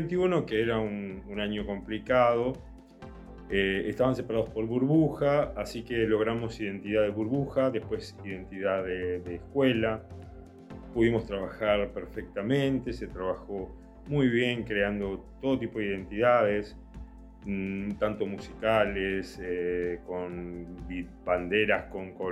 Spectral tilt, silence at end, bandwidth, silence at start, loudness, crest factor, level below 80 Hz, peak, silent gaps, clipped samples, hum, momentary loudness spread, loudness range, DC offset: -7 dB/octave; 0 s; 13 kHz; 0 s; -29 LUFS; 18 dB; -50 dBFS; -12 dBFS; none; under 0.1%; none; 15 LU; 3 LU; under 0.1%